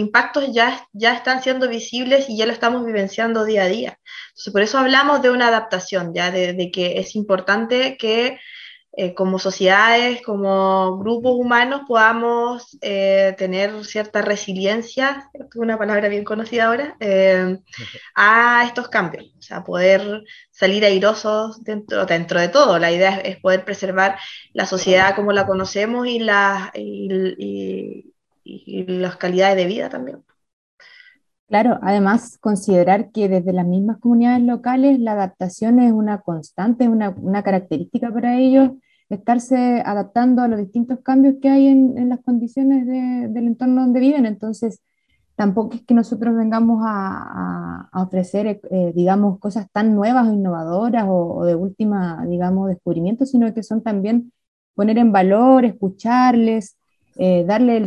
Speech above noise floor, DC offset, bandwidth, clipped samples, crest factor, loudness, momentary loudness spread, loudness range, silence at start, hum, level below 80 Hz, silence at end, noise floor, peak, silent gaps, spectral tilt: 32 dB; under 0.1%; 10.5 kHz; under 0.1%; 18 dB; -17 LUFS; 12 LU; 4 LU; 0 s; none; -60 dBFS; 0 s; -49 dBFS; 0 dBFS; 30.53-30.78 s, 31.39-31.47 s, 54.48-54.74 s; -5.5 dB/octave